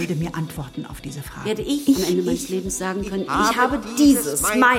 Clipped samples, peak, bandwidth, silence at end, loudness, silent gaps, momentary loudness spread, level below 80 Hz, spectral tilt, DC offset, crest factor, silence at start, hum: under 0.1%; -4 dBFS; 16.5 kHz; 0 s; -21 LUFS; none; 16 LU; -42 dBFS; -4 dB/octave; under 0.1%; 16 dB; 0 s; none